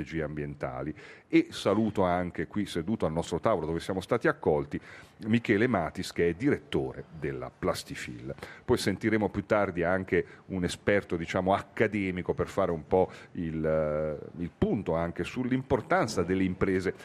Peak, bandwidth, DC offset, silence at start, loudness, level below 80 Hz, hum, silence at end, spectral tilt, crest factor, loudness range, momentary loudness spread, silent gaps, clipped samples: -8 dBFS; 14.5 kHz; under 0.1%; 0 s; -30 LUFS; -54 dBFS; none; 0 s; -6.5 dB/octave; 22 dB; 2 LU; 11 LU; none; under 0.1%